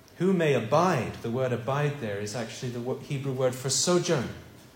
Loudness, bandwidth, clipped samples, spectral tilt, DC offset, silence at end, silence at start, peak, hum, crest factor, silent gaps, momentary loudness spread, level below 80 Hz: -27 LUFS; 16.5 kHz; under 0.1%; -4.5 dB/octave; under 0.1%; 0.1 s; 0.15 s; -10 dBFS; none; 18 dB; none; 10 LU; -62 dBFS